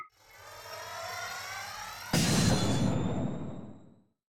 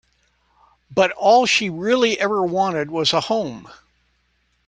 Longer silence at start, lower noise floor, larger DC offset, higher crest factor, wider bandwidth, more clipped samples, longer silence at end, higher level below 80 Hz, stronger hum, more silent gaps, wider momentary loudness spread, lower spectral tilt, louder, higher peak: second, 0 s vs 0.9 s; second, -58 dBFS vs -65 dBFS; neither; about the same, 16 dB vs 18 dB; first, 17 kHz vs 10 kHz; neither; second, 0.05 s vs 0.95 s; first, -52 dBFS vs -60 dBFS; second, none vs 60 Hz at -55 dBFS; neither; first, 22 LU vs 9 LU; about the same, -4.5 dB/octave vs -3.5 dB/octave; second, -32 LUFS vs -18 LUFS; second, -16 dBFS vs -2 dBFS